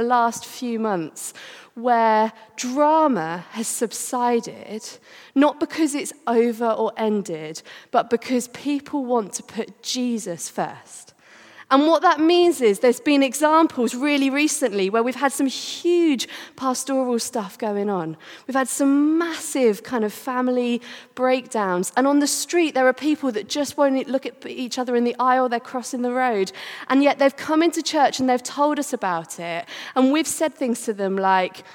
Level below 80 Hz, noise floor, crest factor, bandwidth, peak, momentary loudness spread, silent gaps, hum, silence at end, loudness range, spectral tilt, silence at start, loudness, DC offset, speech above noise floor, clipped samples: -76 dBFS; -47 dBFS; 20 dB; 18.5 kHz; -2 dBFS; 12 LU; none; none; 0 s; 5 LU; -3.5 dB/octave; 0 s; -21 LUFS; under 0.1%; 26 dB; under 0.1%